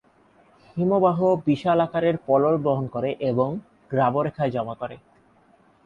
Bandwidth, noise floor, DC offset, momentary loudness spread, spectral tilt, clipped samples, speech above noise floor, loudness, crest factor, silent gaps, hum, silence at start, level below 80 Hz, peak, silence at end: 7.2 kHz; -58 dBFS; under 0.1%; 11 LU; -9 dB/octave; under 0.1%; 36 dB; -23 LUFS; 16 dB; none; none; 0.75 s; -60 dBFS; -6 dBFS; 0.9 s